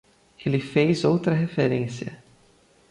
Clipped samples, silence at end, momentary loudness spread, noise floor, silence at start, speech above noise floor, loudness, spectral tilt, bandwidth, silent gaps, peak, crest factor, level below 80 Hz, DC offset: under 0.1%; 0.75 s; 12 LU; -58 dBFS; 0.4 s; 36 dB; -23 LUFS; -7 dB/octave; 11 kHz; none; -8 dBFS; 16 dB; -60 dBFS; under 0.1%